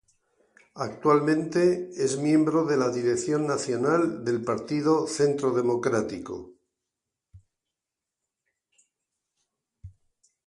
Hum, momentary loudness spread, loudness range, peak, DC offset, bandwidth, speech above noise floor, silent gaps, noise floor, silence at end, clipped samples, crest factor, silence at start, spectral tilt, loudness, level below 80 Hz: none; 7 LU; 8 LU; -8 dBFS; under 0.1%; 11.5 kHz; 63 dB; none; -88 dBFS; 0.6 s; under 0.1%; 18 dB; 0.75 s; -6 dB/octave; -25 LUFS; -64 dBFS